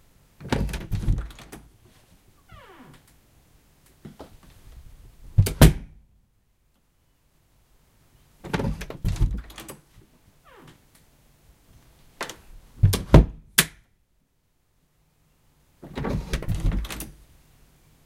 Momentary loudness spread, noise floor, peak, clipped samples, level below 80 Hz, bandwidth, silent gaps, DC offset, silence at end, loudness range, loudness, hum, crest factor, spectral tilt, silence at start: 28 LU; -69 dBFS; 0 dBFS; under 0.1%; -32 dBFS; 16.5 kHz; none; under 0.1%; 0.95 s; 13 LU; -24 LUFS; none; 28 dB; -5 dB/octave; 0.4 s